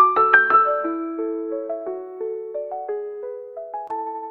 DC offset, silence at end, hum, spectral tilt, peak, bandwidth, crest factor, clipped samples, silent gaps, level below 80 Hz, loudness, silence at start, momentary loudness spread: under 0.1%; 0 s; none; -6.5 dB/octave; 0 dBFS; 5 kHz; 22 dB; under 0.1%; none; -74 dBFS; -21 LUFS; 0 s; 19 LU